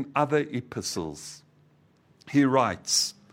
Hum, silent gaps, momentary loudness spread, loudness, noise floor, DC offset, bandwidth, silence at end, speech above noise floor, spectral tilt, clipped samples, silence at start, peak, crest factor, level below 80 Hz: none; none; 14 LU; -26 LUFS; -62 dBFS; under 0.1%; 16 kHz; 0.2 s; 35 dB; -3.5 dB/octave; under 0.1%; 0 s; -8 dBFS; 20 dB; -64 dBFS